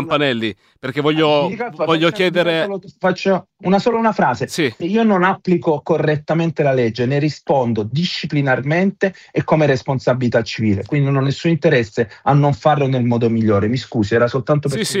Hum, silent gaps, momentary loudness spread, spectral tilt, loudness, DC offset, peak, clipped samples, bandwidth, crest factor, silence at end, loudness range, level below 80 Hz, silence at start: none; none; 5 LU; -6.5 dB/octave; -17 LUFS; under 0.1%; 0 dBFS; under 0.1%; 14 kHz; 16 dB; 0 s; 1 LU; -54 dBFS; 0 s